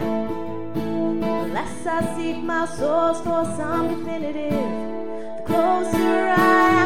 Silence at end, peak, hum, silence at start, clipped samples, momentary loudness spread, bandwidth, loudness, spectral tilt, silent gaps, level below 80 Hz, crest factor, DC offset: 0 s; -4 dBFS; none; 0 s; under 0.1%; 11 LU; 16 kHz; -22 LUFS; -6 dB/octave; none; -50 dBFS; 18 dB; 3%